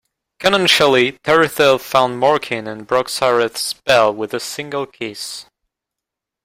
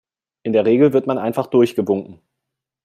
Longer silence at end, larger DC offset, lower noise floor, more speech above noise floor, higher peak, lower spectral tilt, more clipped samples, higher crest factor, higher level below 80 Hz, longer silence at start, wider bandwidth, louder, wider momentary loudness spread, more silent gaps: first, 1 s vs 0.7 s; neither; about the same, -84 dBFS vs -81 dBFS; about the same, 67 dB vs 65 dB; about the same, 0 dBFS vs -2 dBFS; second, -3 dB/octave vs -8 dB/octave; neither; about the same, 16 dB vs 16 dB; first, -56 dBFS vs -62 dBFS; about the same, 0.4 s vs 0.45 s; about the same, 16 kHz vs 15 kHz; about the same, -16 LUFS vs -17 LUFS; first, 13 LU vs 8 LU; neither